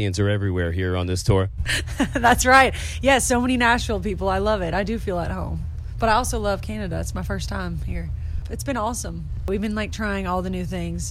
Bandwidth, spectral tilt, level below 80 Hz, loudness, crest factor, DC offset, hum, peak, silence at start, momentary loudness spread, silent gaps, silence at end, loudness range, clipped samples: 16 kHz; -4.5 dB/octave; -32 dBFS; -22 LUFS; 16 dB; under 0.1%; none; -6 dBFS; 0 s; 12 LU; none; 0 s; 8 LU; under 0.1%